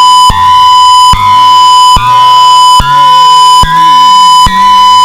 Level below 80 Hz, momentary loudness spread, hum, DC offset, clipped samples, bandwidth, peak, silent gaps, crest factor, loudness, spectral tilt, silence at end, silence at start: -22 dBFS; 2 LU; none; under 0.1%; 2%; 16 kHz; 0 dBFS; none; 2 dB; -2 LUFS; -1.5 dB/octave; 0 s; 0 s